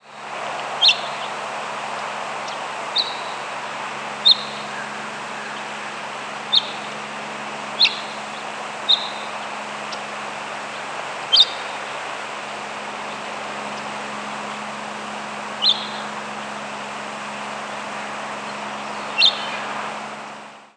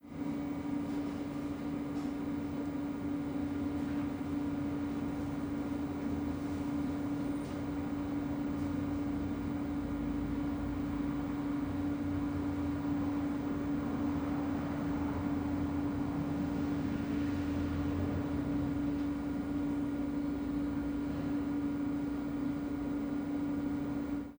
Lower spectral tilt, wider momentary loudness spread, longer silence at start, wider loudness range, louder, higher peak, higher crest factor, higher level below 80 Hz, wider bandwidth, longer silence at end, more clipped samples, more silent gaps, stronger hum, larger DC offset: second, -1 dB/octave vs -8 dB/octave; first, 14 LU vs 3 LU; about the same, 0.05 s vs 0.05 s; first, 5 LU vs 2 LU; first, -23 LUFS vs -36 LUFS; first, -2 dBFS vs -24 dBFS; first, 22 dB vs 12 dB; second, -76 dBFS vs -50 dBFS; second, 11 kHz vs over 20 kHz; about the same, 0.05 s vs 0 s; neither; neither; neither; neither